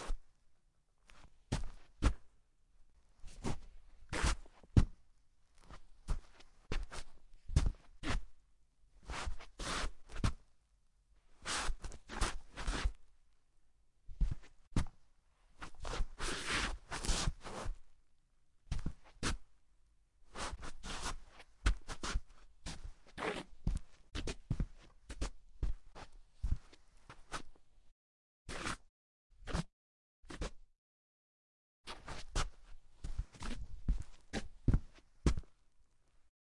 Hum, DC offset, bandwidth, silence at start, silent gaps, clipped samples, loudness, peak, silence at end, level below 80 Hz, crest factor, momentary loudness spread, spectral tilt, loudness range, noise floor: none; under 0.1%; 11.5 kHz; 0 s; 14.67-14.71 s, 27.92-28.45 s, 28.89-29.30 s, 29.73-30.23 s, 30.78-31.84 s; under 0.1%; -43 LUFS; -12 dBFS; 0.3 s; -44 dBFS; 28 dB; 17 LU; -4.5 dB/octave; 7 LU; -72 dBFS